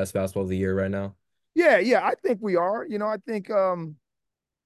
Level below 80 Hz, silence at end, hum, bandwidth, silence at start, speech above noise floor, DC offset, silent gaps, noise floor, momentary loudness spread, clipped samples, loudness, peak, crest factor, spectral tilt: -52 dBFS; 0.7 s; none; 12.5 kHz; 0 s; 61 dB; under 0.1%; none; -85 dBFS; 12 LU; under 0.1%; -24 LUFS; -6 dBFS; 18 dB; -6.5 dB/octave